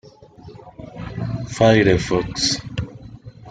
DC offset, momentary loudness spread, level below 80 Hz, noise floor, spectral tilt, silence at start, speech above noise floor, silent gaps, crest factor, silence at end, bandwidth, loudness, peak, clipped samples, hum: under 0.1%; 25 LU; -42 dBFS; -43 dBFS; -5 dB/octave; 0.05 s; 26 dB; none; 20 dB; 0 s; 9.4 kHz; -19 LUFS; -2 dBFS; under 0.1%; none